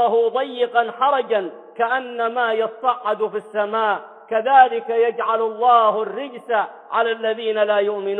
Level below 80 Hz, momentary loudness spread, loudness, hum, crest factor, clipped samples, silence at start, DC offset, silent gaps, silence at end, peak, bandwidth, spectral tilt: -72 dBFS; 9 LU; -19 LUFS; none; 18 dB; under 0.1%; 0 s; under 0.1%; none; 0 s; -2 dBFS; 4.1 kHz; -5.5 dB/octave